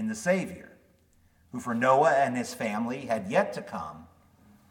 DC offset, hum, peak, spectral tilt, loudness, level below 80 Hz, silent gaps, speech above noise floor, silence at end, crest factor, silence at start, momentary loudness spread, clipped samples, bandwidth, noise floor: under 0.1%; none; -10 dBFS; -5.5 dB/octave; -27 LUFS; -66 dBFS; none; 36 dB; 0.65 s; 20 dB; 0 s; 17 LU; under 0.1%; 17.5 kHz; -63 dBFS